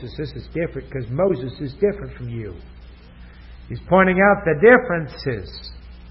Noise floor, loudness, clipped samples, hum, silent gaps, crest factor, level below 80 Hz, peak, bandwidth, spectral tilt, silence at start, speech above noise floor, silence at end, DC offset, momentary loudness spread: -42 dBFS; -19 LUFS; under 0.1%; none; none; 20 dB; -40 dBFS; 0 dBFS; 5.8 kHz; -11.5 dB/octave; 0 s; 22 dB; 0.05 s; under 0.1%; 22 LU